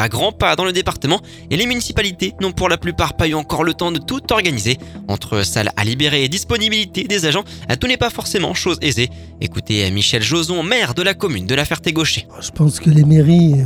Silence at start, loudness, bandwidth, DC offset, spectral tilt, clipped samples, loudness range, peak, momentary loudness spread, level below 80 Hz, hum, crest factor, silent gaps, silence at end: 0 s; -16 LUFS; 16.5 kHz; under 0.1%; -4.5 dB/octave; under 0.1%; 2 LU; 0 dBFS; 7 LU; -36 dBFS; none; 16 dB; none; 0 s